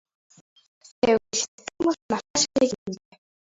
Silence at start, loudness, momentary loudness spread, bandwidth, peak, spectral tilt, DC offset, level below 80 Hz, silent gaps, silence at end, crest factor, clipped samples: 1.05 s; -25 LUFS; 12 LU; 8 kHz; -8 dBFS; -2.5 dB/octave; under 0.1%; -60 dBFS; 1.48-1.58 s, 2.02-2.09 s, 2.30-2.34 s, 2.78-2.86 s; 0.65 s; 20 dB; under 0.1%